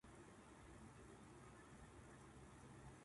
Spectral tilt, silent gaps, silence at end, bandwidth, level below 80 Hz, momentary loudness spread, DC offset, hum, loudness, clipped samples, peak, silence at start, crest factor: -5 dB/octave; none; 0 s; 11.5 kHz; -70 dBFS; 1 LU; under 0.1%; none; -63 LUFS; under 0.1%; -50 dBFS; 0.05 s; 12 dB